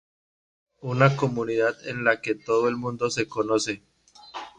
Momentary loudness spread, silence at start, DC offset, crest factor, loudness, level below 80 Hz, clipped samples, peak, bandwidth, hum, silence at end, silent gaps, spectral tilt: 14 LU; 0.85 s; under 0.1%; 22 dB; -25 LUFS; -64 dBFS; under 0.1%; -4 dBFS; 10 kHz; none; 0.1 s; none; -5.5 dB/octave